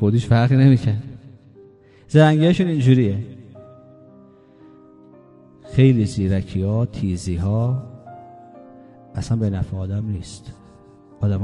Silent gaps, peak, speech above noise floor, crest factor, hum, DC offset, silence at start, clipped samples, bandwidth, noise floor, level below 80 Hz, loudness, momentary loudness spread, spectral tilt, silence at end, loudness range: none; 0 dBFS; 31 dB; 20 dB; none; under 0.1%; 0 s; under 0.1%; 10.5 kHz; -48 dBFS; -40 dBFS; -19 LUFS; 21 LU; -8 dB/octave; 0 s; 9 LU